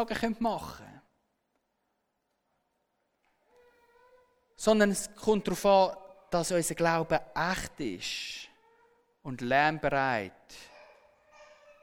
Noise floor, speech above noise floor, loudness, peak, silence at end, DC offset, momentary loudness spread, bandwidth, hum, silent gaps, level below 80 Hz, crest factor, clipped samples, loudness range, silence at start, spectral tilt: -79 dBFS; 51 dB; -29 LUFS; -12 dBFS; 0.4 s; under 0.1%; 21 LU; 18.5 kHz; none; none; -56 dBFS; 20 dB; under 0.1%; 7 LU; 0 s; -4 dB/octave